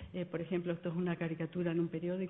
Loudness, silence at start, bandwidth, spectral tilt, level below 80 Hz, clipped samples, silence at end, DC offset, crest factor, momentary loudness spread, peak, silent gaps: -37 LUFS; 0 s; 3.9 kHz; -7.5 dB/octave; -64 dBFS; under 0.1%; 0 s; under 0.1%; 14 dB; 3 LU; -22 dBFS; none